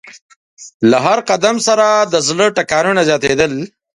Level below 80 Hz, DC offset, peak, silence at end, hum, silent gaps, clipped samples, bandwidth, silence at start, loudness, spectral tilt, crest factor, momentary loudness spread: -52 dBFS; under 0.1%; 0 dBFS; 0.3 s; none; 0.22-0.29 s, 0.36-0.57 s, 0.74-0.80 s; under 0.1%; 11.5 kHz; 0.05 s; -13 LUFS; -3.5 dB/octave; 14 dB; 4 LU